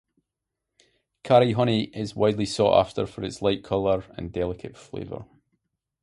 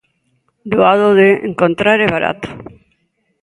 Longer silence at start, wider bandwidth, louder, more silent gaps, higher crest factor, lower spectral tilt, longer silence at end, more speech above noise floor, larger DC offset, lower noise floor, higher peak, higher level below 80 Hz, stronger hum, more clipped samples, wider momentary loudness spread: first, 1.25 s vs 0.65 s; about the same, 11.5 kHz vs 11 kHz; second, -24 LUFS vs -12 LUFS; neither; first, 22 dB vs 14 dB; about the same, -6 dB/octave vs -7 dB/octave; about the same, 0.8 s vs 0.8 s; first, 61 dB vs 52 dB; neither; first, -84 dBFS vs -64 dBFS; second, -4 dBFS vs 0 dBFS; about the same, -50 dBFS vs -50 dBFS; neither; neither; about the same, 18 LU vs 16 LU